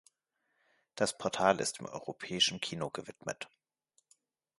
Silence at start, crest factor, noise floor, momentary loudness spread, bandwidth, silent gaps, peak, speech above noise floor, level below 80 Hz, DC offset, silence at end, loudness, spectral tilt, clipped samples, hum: 0.95 s; 28 dB; -81 dBFS; 14 LU; 11.5 kHz; none; -10 dBFS; 47 dB; -72 dBFS; under 0.1%; 1.15 s; -34 LUFS; -2.5 dB/octave; under 0.1%; none